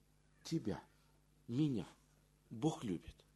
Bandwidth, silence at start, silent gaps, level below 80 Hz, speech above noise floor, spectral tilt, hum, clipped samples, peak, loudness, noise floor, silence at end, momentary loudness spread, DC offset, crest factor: 12 kHz; 0.45 s; none; -68 dBFS; 31 dB; -7 dB/octave; 50 Hz at -65 dBFS; under 0.1%; -24 dBFS; -42 LUFS; -71 dBFS; 0.25 s; 17 LU; under 0.1%; 20 dB